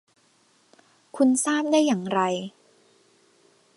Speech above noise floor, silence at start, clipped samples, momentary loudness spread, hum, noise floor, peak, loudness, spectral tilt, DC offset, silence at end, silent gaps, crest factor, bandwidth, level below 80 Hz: 41 dB; 1.15 s; under 0.1%; 15 LU; none; -63 dBFS; -8 dBFS; -23 LUFS; -4 dB/octave; under 0.1%; 1.3 s; none; 18 dB; 11.5 kHz; -78 dBFS